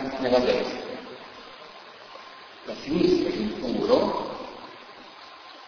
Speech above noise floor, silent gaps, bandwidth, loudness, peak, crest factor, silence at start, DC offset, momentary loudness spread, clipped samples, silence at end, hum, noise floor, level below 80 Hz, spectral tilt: 21 dB; none; 5.4 kHz; -25 LUFS; -8 dBFS; 20 dB; 0 s; under 0.1%; 21 LU; under 0.1%; 0 s; none; -45 dBFS; -56 dBFS; -6 dB/octave